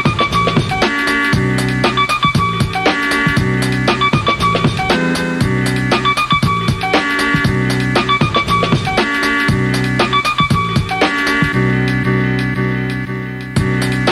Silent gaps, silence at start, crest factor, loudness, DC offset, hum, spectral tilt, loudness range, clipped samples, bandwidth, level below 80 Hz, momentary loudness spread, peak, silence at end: none; 0 s; 14 dB; -14 LUFS; under 0.1%; none; -5.5 dB/octave; 1 LU; under 0.1%; 14 kHz; -34 dBFS; 3 LU; -2 dBFS; 0 s